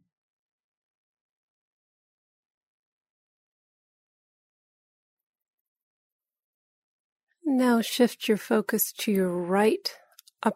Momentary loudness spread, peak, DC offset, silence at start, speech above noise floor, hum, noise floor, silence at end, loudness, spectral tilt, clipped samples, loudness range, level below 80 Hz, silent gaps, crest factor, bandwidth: 7 LU; -10 dBFS; under 0.1%; 7.45 s; over 65 dB; none; under -90 dBFS; 0 s; -25 LUFS; -4.5 dB/octave; under 0.1%; 6 LU; -78 dBFS; none; 22 dB; 16 kHz